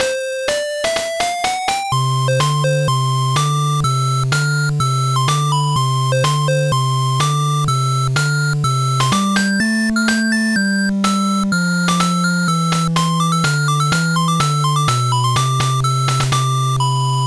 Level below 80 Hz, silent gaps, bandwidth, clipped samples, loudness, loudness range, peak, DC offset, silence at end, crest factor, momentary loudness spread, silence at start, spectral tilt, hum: -44 dBFS; none; 11 kHz; under 0.1%; -16 LUFS; 1 LU; -4 dBFS; under 0.1%; 0 s; 12 dB; 2 LU; 0 s; -5 dB/octave; none